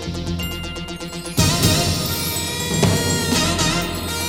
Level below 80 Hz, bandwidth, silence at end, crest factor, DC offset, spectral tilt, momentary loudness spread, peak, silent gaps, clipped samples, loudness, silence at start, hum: -36 dBFS; 17 kHz; 0 s; 18 dB; 0.3%; -3.5 dB/octave; 12 LU; -2 dBFS; none; under 0.1%; -19 LUFS; 0 s; none